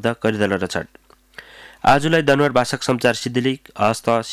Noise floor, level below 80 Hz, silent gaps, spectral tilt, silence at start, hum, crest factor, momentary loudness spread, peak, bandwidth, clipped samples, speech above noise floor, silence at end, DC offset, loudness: -44 dBFS; -50 dBFS; none; -5 dB/octave; 0 s; none; 14 dB; 9 LU; -4 dBFS; 16 kHz; under 0.1%; 26 dB; 0 s; under 0.1%; -19 LUFS